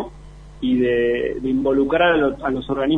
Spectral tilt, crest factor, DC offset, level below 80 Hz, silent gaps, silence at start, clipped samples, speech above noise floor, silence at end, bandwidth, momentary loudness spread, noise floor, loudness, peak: -7.5 dB/octave; 16 dB; under 0.1%; -42 dBFS; none; 0 s; under 0.1%; 21 dB; 0 s; 6.4 kHz; 8 LU; -40 dBFS; -19 LUFS; -4 dBFS